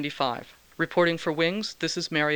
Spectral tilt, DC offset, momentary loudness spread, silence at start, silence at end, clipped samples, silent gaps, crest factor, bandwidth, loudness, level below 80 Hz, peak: -4.5 dB/octave; under 0.1%; 6 LU; 0 s; 0 s; under 0.1%; none; 18 dB; over 20 kHz; -26 LUFS; -66 dBFS; -10 dBFS